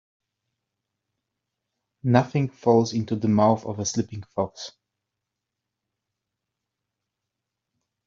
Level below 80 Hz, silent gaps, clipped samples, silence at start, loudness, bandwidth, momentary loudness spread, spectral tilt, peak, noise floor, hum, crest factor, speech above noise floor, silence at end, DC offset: -64 dBFS; none; under 0.1%; 2.05 s; -24 LUFS; 7.6 kHz; 11 LU; -6 dB/octave; -4 dBFS; -84 dBFS; none; 24 dB; 62 dB; 3.35 s; under 0.1%